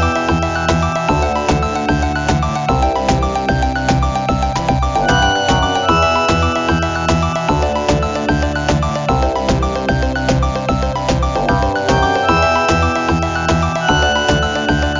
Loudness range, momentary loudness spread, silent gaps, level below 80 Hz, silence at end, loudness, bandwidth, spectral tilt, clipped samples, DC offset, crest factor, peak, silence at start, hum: 2 LU; 4 LU; none; -22 dBFS; 0 s; -15 LUFS; 7.6 kHz; -5 dB/octave; under 0.1%; under 0.1%; 14 dB; -2 dBFS; 0 s; none